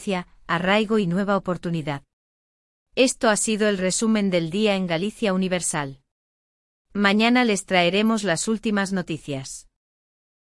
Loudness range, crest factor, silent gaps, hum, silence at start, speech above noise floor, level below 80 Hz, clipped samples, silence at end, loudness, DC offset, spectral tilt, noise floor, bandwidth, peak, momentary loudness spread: 2 LU; 18 dB; 2.13-2.86 s, 6.11-6.85 s; none; 0 s; over 68 dB; -56 dBFS; under 0.1%; 0.8 s; -22 LUFS; under 0.1%; -4 dB/octave; under -90 dBFS; 12 kHz; -4 dBFS; 12 LU